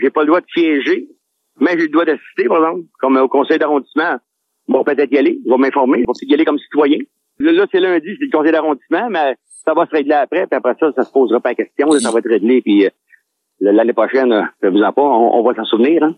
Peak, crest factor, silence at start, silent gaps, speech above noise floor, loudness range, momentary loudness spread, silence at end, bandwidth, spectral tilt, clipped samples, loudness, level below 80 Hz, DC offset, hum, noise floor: 0 dBFS; 14 dB; 0 s; none; 40 dB; 2 LU; 6 LU; 0.05 s; 11 kHz; -5 dB/octave; under 0.1%; -14 LUFS; -62 dBFS; under 0.1%; none; -54 dBFS